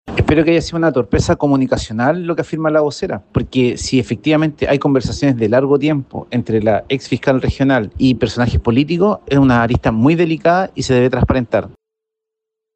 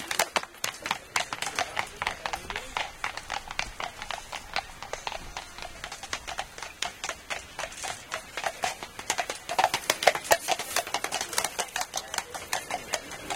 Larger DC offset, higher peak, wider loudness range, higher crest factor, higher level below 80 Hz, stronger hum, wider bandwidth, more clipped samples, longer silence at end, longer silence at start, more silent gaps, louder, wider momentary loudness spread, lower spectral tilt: neither; about the same, -2 dBFS vs -2 dBFS; second, 2 LU vs 8 LU; second, 14 dB vs 30 dB; first, -32 dBFS vs -54 dBFS; neither; second, 8.8 kHz vs 17 kHz; neither; first, 1.05 s vs 0 s; about the same, 0.05 s vs 0 s; neither; first, -15 LUFS vs -31 LUFS; second, 6 LU vs 11 LU; first, -6.5 dB/octave vs -0.5 dB/octave